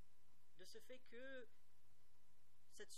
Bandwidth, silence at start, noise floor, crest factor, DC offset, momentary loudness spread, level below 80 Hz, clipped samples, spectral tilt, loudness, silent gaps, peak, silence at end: 15 kHz; 0 s; -80 dBFS; 20 dB; 0.3%; 11 LU; -88 dBFS; under 0.1%; -3 dB/octave; -62 LUFS; none; -42 dBFS; 0 s